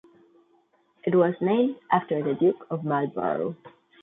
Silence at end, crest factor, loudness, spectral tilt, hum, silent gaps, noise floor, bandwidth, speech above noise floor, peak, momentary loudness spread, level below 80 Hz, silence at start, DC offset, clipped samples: 0.35 s; 18 dB; -25 LUFS; -11 dB/octave; none; none; -65 dBFS; 3.9 kHz; 40 dB; -8 dBFS; 9 LU; -72 dBFS; 1.05 s; under 0.1%; under 0.1%